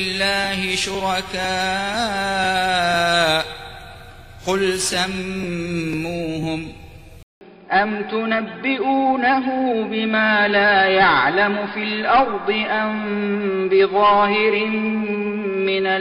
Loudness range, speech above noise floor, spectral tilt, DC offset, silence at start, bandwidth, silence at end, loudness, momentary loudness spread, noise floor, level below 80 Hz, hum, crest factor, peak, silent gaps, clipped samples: 7 LU; 21 dB; -4 dB/octave; under 0.1%; 0 s; 15 kHz; 0 s; -19 LUFS; 10 LU; -40 dBFS; -46 dBFS; none; 18 dB; -2 dBFS; 7.23-7.41 s; under 0.1%